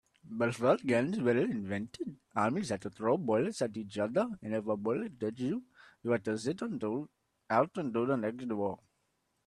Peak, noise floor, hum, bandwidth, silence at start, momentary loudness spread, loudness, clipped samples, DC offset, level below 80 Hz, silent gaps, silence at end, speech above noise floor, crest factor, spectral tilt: -14 dBFS; -79 dBFS; none; 12 kHz; 0.25 s; 9 LU; -33 LUFS; under 0.1%; under 0.1%; -72 dBFS; none; 0.7 s; 46 dB; 20 dB; -6.5 dB/octave